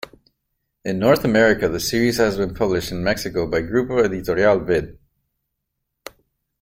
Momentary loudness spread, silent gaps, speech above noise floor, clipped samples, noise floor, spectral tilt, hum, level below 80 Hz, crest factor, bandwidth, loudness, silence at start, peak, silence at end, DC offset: 7 LU; none; 59 dB; under 0.1%; -78 dBFS; -5 dB/octave; none; -44 dBFS; 18 dB; 16.5 kHz; -19 LUFS; 0.85 s; -2 dBFS; 1.7 s; under 0.1%